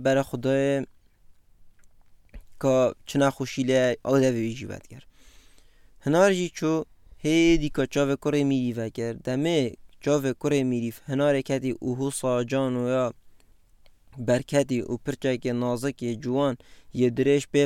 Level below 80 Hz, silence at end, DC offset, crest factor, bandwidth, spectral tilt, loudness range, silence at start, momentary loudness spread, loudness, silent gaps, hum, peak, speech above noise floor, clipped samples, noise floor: -48 dBFS; 0 s; under 0.1%; 18 dB; 15.5 kHz; -6 dB/octave; 3 LU; 0 s; 10 LU; -25 LUFS; none; none; -6 dBFS; 31 dB; under 0.1%; -55 dBFS